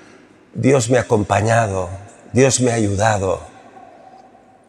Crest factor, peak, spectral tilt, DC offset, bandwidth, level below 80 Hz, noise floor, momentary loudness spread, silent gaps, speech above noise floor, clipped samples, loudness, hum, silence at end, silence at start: 18 dB; -2 dBFS; -5 dB/octave; under 0.1%; 12.5 kHz; -54 dBFS; -47 dBFS; 12 LU; none; 31 dB; under 0.1%; -17 LUFS; none; 1.2 s; 0.55 s